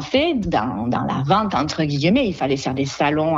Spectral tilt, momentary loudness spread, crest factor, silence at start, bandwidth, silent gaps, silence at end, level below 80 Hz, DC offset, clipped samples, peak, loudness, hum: -6 dB/octave; 4 LU; 14 dB; 0 s; 8 kHz; none; 0 s; -44 dBFS; under 0.1%; under 0.1%; -6 dBFS; -20 LUFS; none